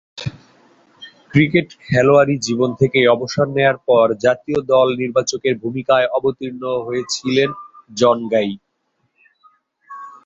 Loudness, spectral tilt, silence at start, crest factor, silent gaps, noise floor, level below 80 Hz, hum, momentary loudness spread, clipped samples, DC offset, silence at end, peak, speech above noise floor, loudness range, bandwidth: -17 LUFS; -5.5 dB/octave; 0.15 s; 16 dB; none; -68 dBFS; -54 dBFS; none; 13 LU; under 0.1%; under 0.1%; 0.15 s; -2 dBFS; 52 dB; 5 LU; 8 kHz